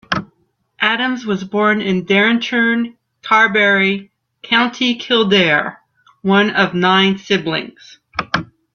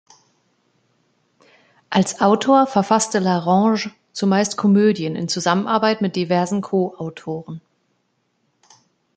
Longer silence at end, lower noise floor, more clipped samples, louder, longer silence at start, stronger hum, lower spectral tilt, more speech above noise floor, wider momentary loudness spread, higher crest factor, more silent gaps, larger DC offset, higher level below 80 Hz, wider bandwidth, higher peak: second, 0.3 s vs 1.6 s; second, -62 dBFS vs -68 dBFS; neither; first, -15 LUFS vs -19 LUFS; second, 0.1 s vs 1.9 s; neither; about the same, -5 dB/octave vs -5 dB/octave; about the same, 47 dB vs 50 dB; about the same, 12 LU vs 14 LU; about the same, 16 dB vs 18 dB; neither; neither; first, -56 dBFS vs -66 dBFS; second, 7 kHz vs 9.2 kHz; about the same, 0 dBFS vs -2 dBFS